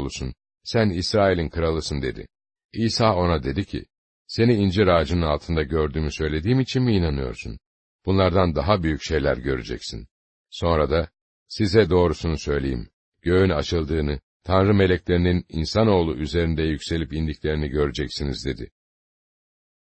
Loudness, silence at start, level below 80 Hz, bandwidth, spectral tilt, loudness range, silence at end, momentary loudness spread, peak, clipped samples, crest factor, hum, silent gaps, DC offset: -22 LUFS; 0 s; -36 dBFS; 8.6 kHz; -6.5 dB/octave; 3 LU; 1.2 s; 14 LU; -4 dBFS; under 0.1%; 20 dB; none; 2.65-2.69 s, 3.98-4.25 s, 7.66-7.99 s, 10.11-10.45 s, 11.21-11.46 s, 12.93-13.12 s, 14.23-14.40 s; under 0.1%